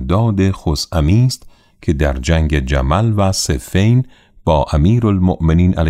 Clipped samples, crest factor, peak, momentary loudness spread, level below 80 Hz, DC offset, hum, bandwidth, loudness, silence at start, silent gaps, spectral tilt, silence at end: under 0.1%; 12 dB; -2 dBFS; 6 LU; -24 dBFS; under 0.1%; none; 15 kHz; -15 LUFS; 0 s; none; -6.5 dB/octave; 0 s